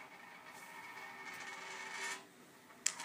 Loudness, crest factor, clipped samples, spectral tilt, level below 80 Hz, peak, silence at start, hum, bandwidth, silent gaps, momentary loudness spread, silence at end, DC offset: -46 LUFS; 36 dB; under 0.1%; 0.5 dB/octave; under -90 dBFS; -12 dBFS; 0 s; none; 15.5 kHz; none; 15 LU; 0 s; under 0.1%